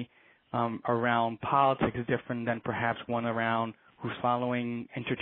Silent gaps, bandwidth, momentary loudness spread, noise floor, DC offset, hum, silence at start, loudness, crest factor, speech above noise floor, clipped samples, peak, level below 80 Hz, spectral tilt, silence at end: none; 4.2 kHz; 10 LU; -57 dBFS; under 0.1%; none; 0 s; -30 LUFS; 18 dB; 27 dB; under 0.1%; -12 dBFS; -62 dBFS; -10 dB/octave; 0 s